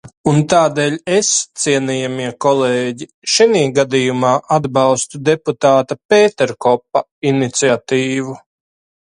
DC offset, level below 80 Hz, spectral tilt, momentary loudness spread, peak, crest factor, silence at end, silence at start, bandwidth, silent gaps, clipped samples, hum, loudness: under 0.1%; -56 dBFS; -4 dB/octave; 7 LU; 0 dBFS; 14 dB; 0.65 s; 0.05 s; 11.5 kHz; 0.17-0.24 s, 3.14-3.22 s, 6.05-6.09 s, 7.11-7.22 s; under 0.1%; none; -15 LUFS